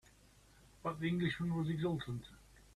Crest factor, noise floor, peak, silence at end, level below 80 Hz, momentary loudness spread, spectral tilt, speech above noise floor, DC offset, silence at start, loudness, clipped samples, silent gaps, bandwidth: 16 dB; -65 dBFS; -24 dBFS; 0.15 s; -64 dBFS; 10 LU; -7 dB/octave; 27 dB; under 0.1%; 0.85 s; -39 LUFS; under 0.1%; none; 13 kHz